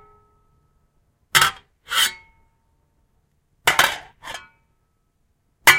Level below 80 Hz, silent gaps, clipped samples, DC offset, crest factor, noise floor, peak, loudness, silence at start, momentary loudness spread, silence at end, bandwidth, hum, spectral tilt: -56 dBFS; none; under 0.1%; under 0.1%; 24 dB; -67 dBFS; 0 dBFS; -19 LUFS; 1.35 s; 20 LU; 0 s; 16 kHz; none; 0 dB/octave